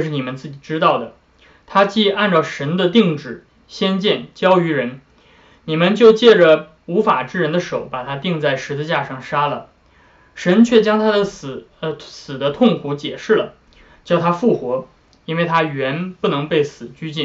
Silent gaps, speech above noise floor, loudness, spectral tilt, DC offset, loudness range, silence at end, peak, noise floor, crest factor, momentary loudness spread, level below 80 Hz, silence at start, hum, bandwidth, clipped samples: none; 35 dB; -17 LUFS; -6 dB/octave; under 0.1%; 5 LU; 0 s; 0 dBFS; -51 dBFS; 16 dB; 15 LU; -56 dBFS; 0 s; none; 7.8 kHz; under 0.1%